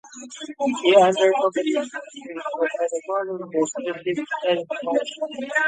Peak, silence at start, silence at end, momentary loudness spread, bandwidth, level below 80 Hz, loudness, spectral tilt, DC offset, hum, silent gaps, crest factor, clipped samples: -4 dBFS; 0.05 s; 0 s; 16 LU; 9.4 kHz; -76 dBFS; -22 LUFS; -3.5 dB/octave; under 0.1%; none; none; 20 dB; under 0.1%